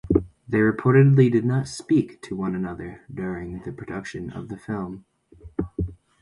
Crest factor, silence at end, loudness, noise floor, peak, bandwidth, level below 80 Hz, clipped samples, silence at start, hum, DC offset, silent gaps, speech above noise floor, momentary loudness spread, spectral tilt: 20 dB; 0.3 s; -23 LUFS; -47 dBFS; -4 dBFS; 11.5 kHz; -44 dBFS; under 0.1%; 0.05 s; none; under 0.1%; none; 24 dB; 18 LU; -8 dB/octave